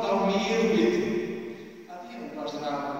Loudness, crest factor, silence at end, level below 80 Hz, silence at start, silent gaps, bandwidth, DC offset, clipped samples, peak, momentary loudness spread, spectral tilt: -27 LUFS; 18 dB; 0 s; -64 dBFS; 0 s; none; 16 kHz; 0.1%; under 0.1%; -10 dBFS; 19 LU; -5.5 dB/octave